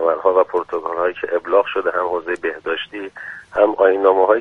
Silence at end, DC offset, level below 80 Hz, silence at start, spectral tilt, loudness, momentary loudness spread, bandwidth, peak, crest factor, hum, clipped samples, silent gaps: 0 s; under 0.1%; -58 dBFS; 0 s; -5.5 dB/octave; -18 LUFS; 11 LU; 4.7 kHz; 0 dBFS; 18 dB; none; under 0.1%; none